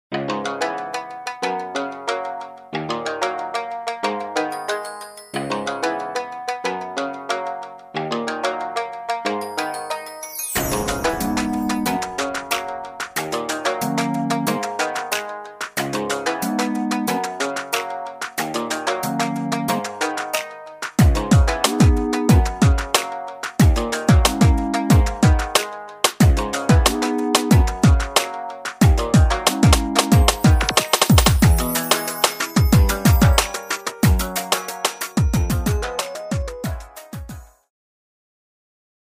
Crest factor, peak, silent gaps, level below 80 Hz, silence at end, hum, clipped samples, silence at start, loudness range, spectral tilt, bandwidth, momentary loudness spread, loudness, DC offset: 20 dB; 0 dBFS; none; -26 dBFS; 1.75 s; none; under 0.1%; 0.1 s; 9 LU; -4.5 dB/octave; 15.5 kHz; 13 LU; -20 LUFS; under 0.1%